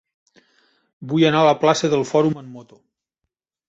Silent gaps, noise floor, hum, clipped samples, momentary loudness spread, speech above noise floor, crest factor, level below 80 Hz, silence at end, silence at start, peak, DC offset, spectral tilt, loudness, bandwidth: none; -81 dBFS; none; under 0.1%; 19 LU; 63 dB; 18 dB; -64 dBFS; 1.05 s; 1 s; -2 dBFS; under 0.1%; -5.5 dB/octave; -18 LUFS; 8 kHz